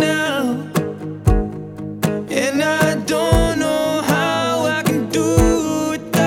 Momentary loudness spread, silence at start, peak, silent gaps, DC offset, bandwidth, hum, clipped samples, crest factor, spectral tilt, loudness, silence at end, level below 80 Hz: 7 LU; 0 s; 0 dBFS; none; under 0.1%; 18 kHz; none; under 0.1%; 16 dB; -5 dB/octave; -18 LUFS; 0 s; -28 dBFS